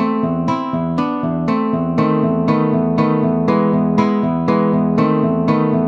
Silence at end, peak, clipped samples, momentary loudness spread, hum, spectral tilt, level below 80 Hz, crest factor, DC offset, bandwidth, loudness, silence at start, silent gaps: 0 s; -2 dBFS; under 0.1%; 4 LU; none; -9.5 dB/octave; -48 dBFS; 14 dB; under 0.1%; 6.6 kHz; -16 LUFS; 0 s; none